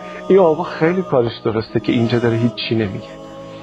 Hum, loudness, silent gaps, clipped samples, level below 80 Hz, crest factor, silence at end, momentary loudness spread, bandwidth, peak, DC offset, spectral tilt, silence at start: none; -17 LUFS; none; under 0.1%; -52 dBFS; 16 dB; 0 s; 16 LU; 8 kHz; -2 dBFS; under 0.1%; -8 dB/octave; 0 s